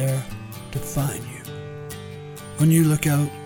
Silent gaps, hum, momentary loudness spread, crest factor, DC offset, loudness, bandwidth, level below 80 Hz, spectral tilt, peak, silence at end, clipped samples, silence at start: none; none; 18 LU; 18 dB; under 0.1%; -22 LUFS; 19 kHz; -46 dBFS; -6 dB/octave; -6 dBFS; 0 s; under 0.1%; 0 s